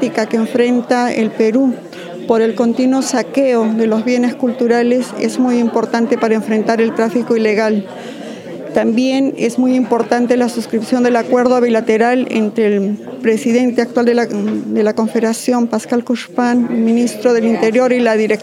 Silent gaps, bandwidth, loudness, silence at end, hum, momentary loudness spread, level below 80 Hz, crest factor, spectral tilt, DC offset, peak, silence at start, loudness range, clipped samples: none; 13 kHz; -14 LUFS; 0 s; none; 5 LU; -64 dBFS; 14 dB; -5.5 dB/octave; under 0.1%; 0 dBFS; 0 s; 2 LU; under 0.1%